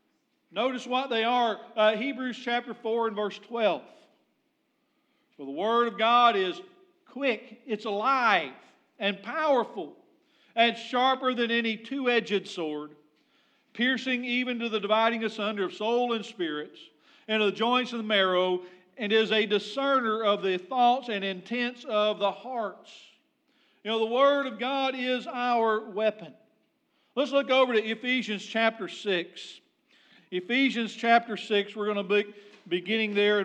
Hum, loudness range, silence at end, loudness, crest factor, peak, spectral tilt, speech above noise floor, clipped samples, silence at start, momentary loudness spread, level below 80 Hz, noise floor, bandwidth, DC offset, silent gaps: none; 3 LU; 0 s; -27 LUFS; 22 dB; -8 dBFS; -4.5 dB/octave; 47 dB; under 0.1%; 0.55 s; 12 LU; under -90 dBFS; -74 dBFS; 9.2 kHz; under 0.1%; none